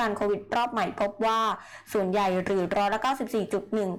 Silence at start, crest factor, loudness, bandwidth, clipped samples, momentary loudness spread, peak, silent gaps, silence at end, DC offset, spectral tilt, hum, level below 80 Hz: 0 s; 6 dB; -27 LUFS; 18 kHz; under 0.1%; 4 LU; -20 dBFS; none; 0 s; under 0.1%; -5.5 dB/octave; none; -58 dBFS